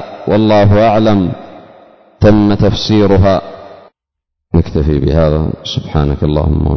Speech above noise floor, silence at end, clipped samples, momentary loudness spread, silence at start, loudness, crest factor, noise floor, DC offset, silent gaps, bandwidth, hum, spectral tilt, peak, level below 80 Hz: 67 dB; 0 s; under 0.1%; 8 LU; 0 s; -11 LUFS; 12 dB; -77 dBFS; under 0.1%; none; 6.4 kHz; none; -8 dB/octave; 0 dBFS; -22 dBFS